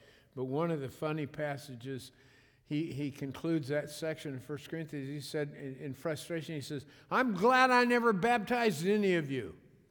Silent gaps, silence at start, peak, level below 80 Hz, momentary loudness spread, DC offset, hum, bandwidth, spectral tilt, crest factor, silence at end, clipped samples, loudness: none; 0.35 s; -12 dBFS; -72 dBFS; 16 LU; under 0.1%; none; 19.5 kHz; -5.5 dB/octave; 20 dB; 0.35 s; under 0.1%; -33 LUFS